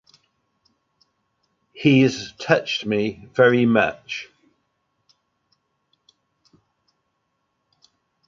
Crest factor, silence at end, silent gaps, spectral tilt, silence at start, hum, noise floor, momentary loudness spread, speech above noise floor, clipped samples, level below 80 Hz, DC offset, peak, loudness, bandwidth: 22 dB; 4.05 s; none; -6 dB/octave; 1.75 s; none; -73 dBFS; 16 LU; 54 dB; under 0.1%; -62 dBFS; under 0.1%; -2 dBFS; -20 LUFS; 7.6 kHz